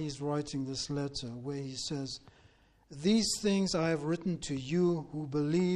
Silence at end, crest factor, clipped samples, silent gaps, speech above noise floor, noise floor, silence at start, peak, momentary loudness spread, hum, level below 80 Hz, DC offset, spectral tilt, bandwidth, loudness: 0 s; 16 dB; under 0.1%; none; 31 dB; -64 dBFS; 0 s; -18 dBFS; 10 LU; none; -60 dBFS; under 0.1%; -5 dB/octave; 12 kHz; -33 LUFS